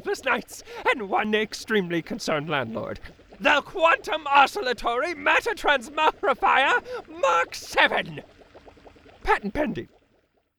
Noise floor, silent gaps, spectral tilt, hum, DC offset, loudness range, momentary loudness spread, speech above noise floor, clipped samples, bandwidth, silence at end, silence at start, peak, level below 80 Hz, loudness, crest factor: -67 dBFS; none; -3.5 dB/octave; none; under 0.1%; 4 LU; 12 LU; 43 dB; under 0.1%; 20 kHz; 0.75 s; 0.05 s; -4 dBFS; -48 dBFS; -23 LUFS; 20 dB